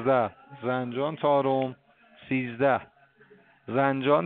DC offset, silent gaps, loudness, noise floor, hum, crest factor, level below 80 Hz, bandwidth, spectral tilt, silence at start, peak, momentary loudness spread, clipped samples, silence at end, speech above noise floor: under 0.1%; none; -27 LUFS; -57 dBFS; none; 18 dB; -70 dBFS; 4.3 kHz; -5 dB/octave; 0 s; -8 dBFS; 9 LU; under 0.1%; 0 s; 32 dB